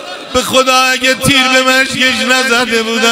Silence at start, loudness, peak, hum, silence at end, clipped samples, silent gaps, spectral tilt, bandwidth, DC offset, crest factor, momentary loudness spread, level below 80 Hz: 0 s; -9 LUFS; 0 dBFS; none; 0 s; 0.2%; none; -2 dB/octave; 16.5 kHz; under 0.1%; 10 dB; 4 LU; -42 dBFS